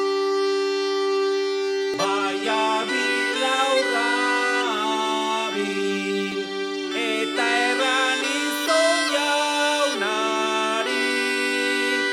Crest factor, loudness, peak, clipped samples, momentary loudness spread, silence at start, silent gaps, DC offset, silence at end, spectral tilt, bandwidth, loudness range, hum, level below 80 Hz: 14 dB; -22 LUFS; -8 dBFS; under 0.1%; 5 LU; 0 s; none; under 0.1%; 0 s; -2 dB/octave; 16 kHz; 3 LU; none; -76 dBFS